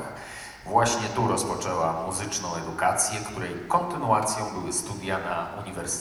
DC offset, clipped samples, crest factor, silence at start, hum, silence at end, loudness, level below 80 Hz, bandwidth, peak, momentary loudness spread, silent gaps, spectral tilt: under 0.1%; under 0.1%; 20 dB; 0 s; none; 0 s; -27 LUFS; -54 dBFS; over 20 kHz; -8 dBFS; 10 LU; none; -3.5 dB/octave